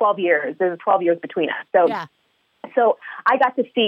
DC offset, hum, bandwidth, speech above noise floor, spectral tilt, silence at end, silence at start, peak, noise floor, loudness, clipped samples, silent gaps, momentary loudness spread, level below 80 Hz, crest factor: under 0.1%; none; 6 kHz; 23 dB; -6.5 dB/octave; 0 s; 0 s; -4 dBFS; -42 dBFS; -20 LUFS; under 0.1%; none; 6 LU; -76 dBFS; 16 dB